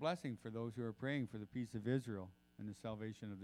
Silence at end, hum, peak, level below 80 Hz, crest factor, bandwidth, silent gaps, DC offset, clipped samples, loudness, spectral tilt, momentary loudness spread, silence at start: 0 s; none; -26 dBFS; -76 dBFS; 18 dB; 14 kHz; none; under 0.1%; under 0.1%; -45 LUFS; -7 dB/octave; 9 LU; 0 s